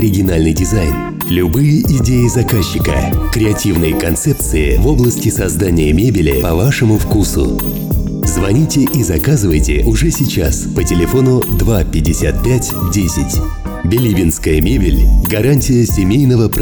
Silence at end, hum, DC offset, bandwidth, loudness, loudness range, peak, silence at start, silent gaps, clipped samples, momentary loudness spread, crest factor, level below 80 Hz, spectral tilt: 0 s; none; under 0.1%; over 20 kHz; -13 LUFS; 1 LU; -2 dBFS; 0 s; none; under 0.1%; 4 LU; 10 dB; -18 dBFS; -6 dB/octave